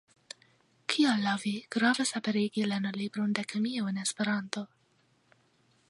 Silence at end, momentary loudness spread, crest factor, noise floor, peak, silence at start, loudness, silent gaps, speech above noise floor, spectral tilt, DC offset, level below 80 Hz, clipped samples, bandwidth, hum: 1.25 s; 17 LU; 22 dB; -69 dBFS; -10 dBFS; 0.9 s; -30 LUFS; none; 39 dB; -4 dB/octave; under 0.1%; -80 dBFS; under 0.1%; 11.5 kHz; none